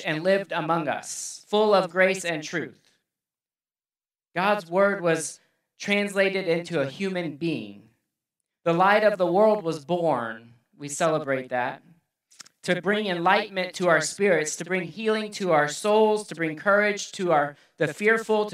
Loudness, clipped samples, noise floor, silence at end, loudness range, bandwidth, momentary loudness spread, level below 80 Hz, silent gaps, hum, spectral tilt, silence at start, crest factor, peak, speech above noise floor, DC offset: -24 LUFS; under 0.1%; under -90 dBFS; 0 s; 4 LU; 15 kHz; 11 LU; -80 dBFS; none; none; -4 dB/octave; 0 s; 20 dB; -4 dBFS; over 66 dB; under 0.1%